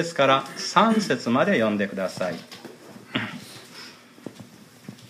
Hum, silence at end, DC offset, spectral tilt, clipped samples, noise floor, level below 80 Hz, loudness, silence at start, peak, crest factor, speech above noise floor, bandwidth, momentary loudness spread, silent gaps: none; 0.05 s; under 0.1%; -4.5 dB/octave; under 0.1%; -47 dBFS; -70 dBFS; -23 LUFS; 0 s; -4 dBFS; 22 dB; 24 dB; 15.5 kHz; 23 LU; none